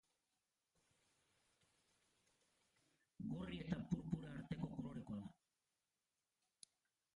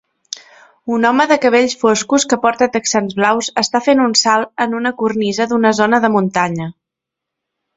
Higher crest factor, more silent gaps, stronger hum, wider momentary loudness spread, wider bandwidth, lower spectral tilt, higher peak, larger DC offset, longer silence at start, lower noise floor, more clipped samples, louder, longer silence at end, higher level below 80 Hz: first, 24 dB vs 16 dB; neither; neither; first, 21 LU vs 11 LU; first, 11 kHz vs 8.2 kHz; first, -7.5 dB/octave vs -3.5 dB/octave; second, -30 dBFS vs 0 dBFS; neither; first, 3.2 s vs 0.85 s; first, under -90 dBFS vs -82 dBFS; neither; second, -49 LUFS vs -14 LUFS; first, 1.85 s vs 1.05 s; second, -70 dBFS vs -58 dBFS